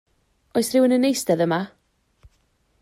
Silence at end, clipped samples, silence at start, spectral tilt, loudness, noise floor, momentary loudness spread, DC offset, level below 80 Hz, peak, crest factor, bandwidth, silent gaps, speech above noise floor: 1.15 s; under 0.1%; 0.55 s; -5 dB/octave; -21 LUFS; -65 dBFS; 9 LU; under 0.1%; -62 dBFS; -8 dBFS; 16 dB; 16 kHz; none; 46 dB